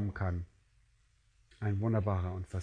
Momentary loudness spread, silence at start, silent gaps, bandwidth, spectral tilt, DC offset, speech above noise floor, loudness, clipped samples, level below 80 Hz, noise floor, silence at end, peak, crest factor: 9 LU; 0 s; none; 9.2 kHz; -9.5 dB/octave; under 0.1%; 36 dB; -35 LUFS; under 0.1%; -54 dBFS; -69 dBFS; 0 s; -18 dBFS; 18 dB